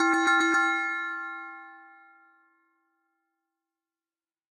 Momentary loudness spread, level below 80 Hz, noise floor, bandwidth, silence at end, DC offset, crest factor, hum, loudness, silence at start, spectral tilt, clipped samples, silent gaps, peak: 19 LU; -86 dBFS; under -90 dBFS; 12.5 kHz; 2.7 s; under 0.1%; 20 dB; none; -25 LUFS; 0 s; -0.5 dB/octave; under 0.1%; none; -12 dBFS